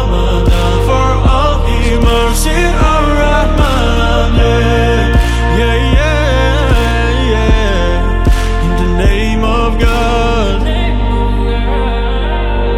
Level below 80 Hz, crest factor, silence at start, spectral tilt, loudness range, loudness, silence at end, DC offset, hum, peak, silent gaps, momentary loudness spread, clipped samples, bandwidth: -12 dBFS; 10 dB; 0 s; -5.5 dB/octave; 2 LU; -12 LUFS; 0 s; 0.5%; none; 0 dBFS; none; 4 LU; under 0.1%; 13.5 kHz